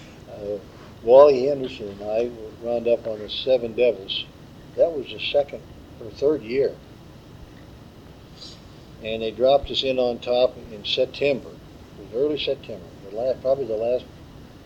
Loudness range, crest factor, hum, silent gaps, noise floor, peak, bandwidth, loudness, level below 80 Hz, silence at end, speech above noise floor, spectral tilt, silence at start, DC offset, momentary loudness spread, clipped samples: 7 LU; 22 dB; none; none; -44 dBFS; -2 dBFS; 8.2 kHz; -23 LUFS; -50 dBFS; 0 s; 22 dB; -5.5 dB/octave; 0 s; under 0.1%; 20 LU; under 0.1%